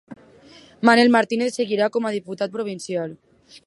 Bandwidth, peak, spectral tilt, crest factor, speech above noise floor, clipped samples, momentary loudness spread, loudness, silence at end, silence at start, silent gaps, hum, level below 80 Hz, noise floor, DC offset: 11.5 kHz; 0 dBFS; -4.5 dB/octave; 20 dB; 28 dB; under 0.1%; 13 LU; -20 LUFS; 0.1 s; 0.1 s; none; none; -70 dBFS; -48 dBFS; under 0.1%